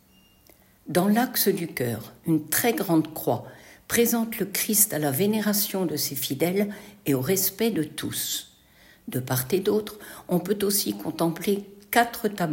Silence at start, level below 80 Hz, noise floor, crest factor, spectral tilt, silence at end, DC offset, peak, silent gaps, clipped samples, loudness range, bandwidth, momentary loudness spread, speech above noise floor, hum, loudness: 0.85 s; -62 dBFS; -57 dBFS; 20 dB; -4 dB/octave; 0 s; under 0.1%; -4 dBFS; none; under 0.1%; 4 LU; 16.5 kHz; 8 LU; 32 dB; none; -25 LUFS